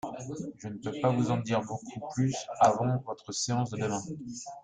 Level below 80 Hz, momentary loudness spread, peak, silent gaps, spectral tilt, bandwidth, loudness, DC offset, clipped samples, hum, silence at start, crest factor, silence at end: -66 dBFS; 14 LU; -10 dBFS; none; -5.5 dB/octave; 9.4 kHz; -31 LUFS; under 0.1%; under 0.1%; none; 0.05 s; 20 dB; 0 s